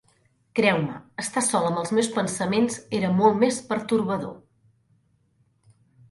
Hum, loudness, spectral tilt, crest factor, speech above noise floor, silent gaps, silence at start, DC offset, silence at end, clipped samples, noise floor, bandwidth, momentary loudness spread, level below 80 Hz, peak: none; -24 LUFS; -4.5 dB/octave; 20 dB; 42 dB; none; 0.55 s; under 0.1%; 1.75 s; under 0.1%; -66 dBFS; 11.5 kHz; 10 LU; -64 dBFS; -6 dBFS